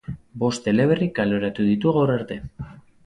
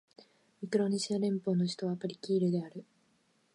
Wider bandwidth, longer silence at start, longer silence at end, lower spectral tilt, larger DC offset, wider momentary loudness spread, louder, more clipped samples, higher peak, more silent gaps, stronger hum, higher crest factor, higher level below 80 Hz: about the same, 10.5 kHz vs 11.5 kHz; second, 0.1 s vs 0.6 s; second, 0.25 s vs 0.75 s; about the same, -7 dB/octave vs -6.5 dB/octave; neither; first, 17 LU vs 13 LU; first, -21 LUFS vs -33 LUFS; neither; first, -6 dBFS vs -16 dBFS; neither; neither; about the same, 16 dB vs 18 dB; first, -50 dBFS vs -80 dBFS